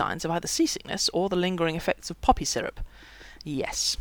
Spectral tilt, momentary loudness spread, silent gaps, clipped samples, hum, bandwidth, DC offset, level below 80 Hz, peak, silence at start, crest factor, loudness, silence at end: -3.5 dB/octave; 15 LU; none; under 0.1%; none; over 20 kHz; under 0.1%; -42 dBFS; -6 dBFS; 0 s; 22 dB; -27 LUFS; 0.05 s